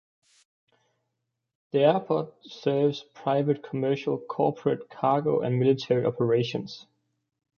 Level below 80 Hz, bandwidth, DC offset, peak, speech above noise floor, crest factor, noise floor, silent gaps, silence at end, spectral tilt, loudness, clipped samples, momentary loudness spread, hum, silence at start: -70 dBFS; 6.8 kHz; under 0.1%; -8 dBFS; 56 dB; 20 dB; -82 dBFS; none; 0.8 s; -8 dB/octave; -26 LUFS; under 0.1%; 9 LU; none; 1.75 s